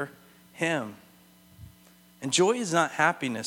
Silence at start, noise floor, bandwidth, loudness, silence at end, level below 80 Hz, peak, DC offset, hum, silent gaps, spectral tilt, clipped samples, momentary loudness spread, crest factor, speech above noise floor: 0 s; -57 dBFS; 17.5 kHz; -26 LUFS; 0 s; -66 dBFS; -8 dBFS; under 0.1%; none; none; -3.5 dB/octave; under 0.1%; 15 LU; 22 dB; 31 dB